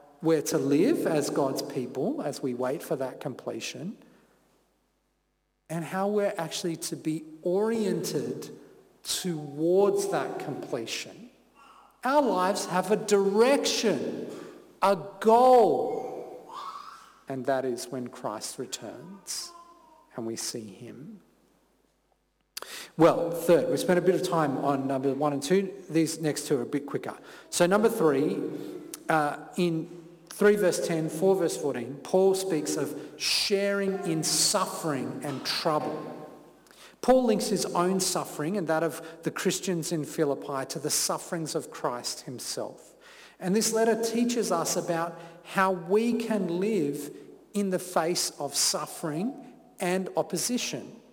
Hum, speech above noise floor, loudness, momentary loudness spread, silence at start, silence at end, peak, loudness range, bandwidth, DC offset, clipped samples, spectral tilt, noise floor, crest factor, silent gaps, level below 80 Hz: none; 47 dB; -27 LUFS; 16 LU; 0.2 s; 0.15 s; -10 dBFS; 9 LU; 19 kHz; under 0.1%; under 0.1%; -4 dB/octave; -75 dBFS; 18 dB; none; -68 dBFS